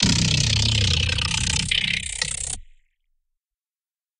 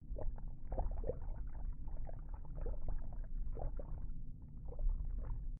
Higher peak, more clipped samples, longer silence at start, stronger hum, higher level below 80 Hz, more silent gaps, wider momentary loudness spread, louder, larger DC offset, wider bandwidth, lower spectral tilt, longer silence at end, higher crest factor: first, -4 dBFS vs -26 dBFS; neither; about the same, 0 s vs 0 s; neither; first, -36 dBFS vs -42 dBFS; neither; about the same, 8 LU vs 8 LU; first, -21 LUFS vs -48 LUFS; neither; first, 12 kHz vs 2 kHz; second, -2.5 dB/octave vs -9 dB/octave; first, 1.55 s vs 0 s; first, 20 dB vs 14 dB